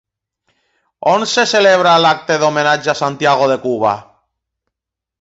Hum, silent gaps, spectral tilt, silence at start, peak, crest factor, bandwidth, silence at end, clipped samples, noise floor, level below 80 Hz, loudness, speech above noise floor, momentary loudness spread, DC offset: none; none; -3.5 dB/octave; 1 s; 0 dBFS; 14 dB; 8 kHz; 1.2 s; under 0.1%; -83 dBFS; -60 dBFS; -13 LUFS; 70 dB; 7 LU; under 0.1%